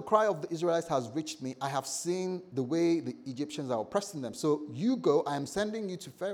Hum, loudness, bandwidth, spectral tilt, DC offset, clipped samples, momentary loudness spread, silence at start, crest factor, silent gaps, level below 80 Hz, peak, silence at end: none; -32 LUFS; 16.5 kHz; -5 dB/octave; under 0.1%; under 0.1%; 10 LU; 0 s; 20 dB; none; -72 dBFS; -12 dBFS; 0 s